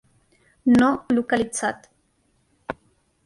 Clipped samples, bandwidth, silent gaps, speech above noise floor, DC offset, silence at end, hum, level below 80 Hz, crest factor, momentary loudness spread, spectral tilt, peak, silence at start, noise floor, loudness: under 0.1%; 11.5 kHz; none; 46 dB; under 0.1%; 0.5 s; none; -56 dBFS; 16 dB; 21 LU; -4.5 dB/octave; -8 dBFS; 0.65 s; -66 dBFS; -21 LUFS